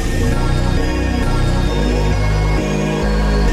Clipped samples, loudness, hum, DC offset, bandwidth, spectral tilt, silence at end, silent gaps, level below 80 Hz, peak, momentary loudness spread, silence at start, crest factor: under 0.1%; -17 LUFS; none; under 0.1%; 13.5 kHz; -6 dB/octave; 0 s; none; -18 dBFS; -4 dBFS; 1 LU; 0 s; 12 dB